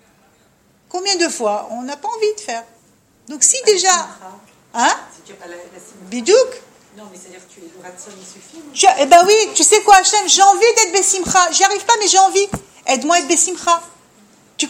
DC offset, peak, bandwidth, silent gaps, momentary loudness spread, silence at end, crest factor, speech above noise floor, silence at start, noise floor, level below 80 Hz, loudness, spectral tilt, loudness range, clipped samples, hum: under 0.1%; 0 dBFS; 16.5 kHz; none; 19 LU; 0 s; 16 dB; 40 dB; 0.95 s; -55 dBFS; -54 dBFS; -13 LUFS; -0.5 dB/octave; 11 LU; under 0.1%; none